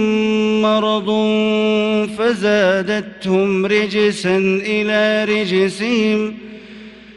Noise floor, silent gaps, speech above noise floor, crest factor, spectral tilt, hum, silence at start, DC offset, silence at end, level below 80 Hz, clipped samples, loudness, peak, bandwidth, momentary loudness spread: -37 dBFS; none; 21 dB; 14 dB; -5.5 dB/octave; none; 0 s; under 0.1%; 0.05 s; -54 dBFS; under 0.1%; -16 LUFS; -4 dBFS; 11 kHz; 6 LU